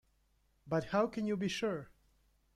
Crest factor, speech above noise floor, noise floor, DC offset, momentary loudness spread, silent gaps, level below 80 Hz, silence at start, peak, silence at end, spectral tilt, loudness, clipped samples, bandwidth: 18 dB; 39 dB; -74 dBFS; under 0.1%; 5 LU; none; -66 dBFS; 0.65 s; -20 dBFS; 0.7 s; -5.5 dB/octave; -36 LUFS; under 0.1%; 13.5 kHz